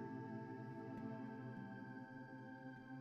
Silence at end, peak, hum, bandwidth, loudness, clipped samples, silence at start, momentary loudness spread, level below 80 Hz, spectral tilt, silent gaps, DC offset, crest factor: 0 s; -38 dBFS; none; 7.6 kHz; -52 LUFS; under 0.1%; 0 s; 5 LU; -82 dBFS; -7.5 dB/octave; none; under 0.1%; 14 dB